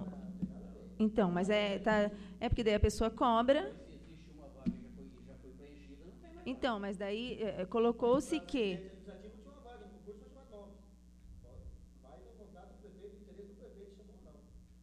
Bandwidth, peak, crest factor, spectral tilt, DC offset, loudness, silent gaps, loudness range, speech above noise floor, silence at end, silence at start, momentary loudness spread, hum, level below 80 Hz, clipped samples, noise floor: 13.5 kHz; -16 dBFS; 22 dB; -6 dB/octave; under 0.1%; -35 LUFS; none; 23 LU; 26 dB; 0.2 s; 0 s; 24 LU; none; -50 dBFS; under 0.1%; -59 dBFS